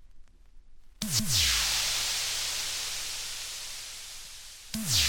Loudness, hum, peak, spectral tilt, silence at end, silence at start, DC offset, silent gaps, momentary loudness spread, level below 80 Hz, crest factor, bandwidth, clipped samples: -28 LUFS; none; -12 dBFS; -0.5 dB/octave; 0 s; 0 s; under 0.1%; none; 17 LU; -48 dBFS; 20 dB; 18 kHz; under 0.1%